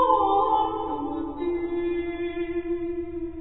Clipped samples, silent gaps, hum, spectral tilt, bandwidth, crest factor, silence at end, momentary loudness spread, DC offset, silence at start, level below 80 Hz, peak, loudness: under 0.1%; none; none; -10 dB/octave; 4.1 kHz; 18 dB; 0 s; 10 LU; 0.5%; 0 s; -46 dBFS; -8 dBFS; -27 LUFS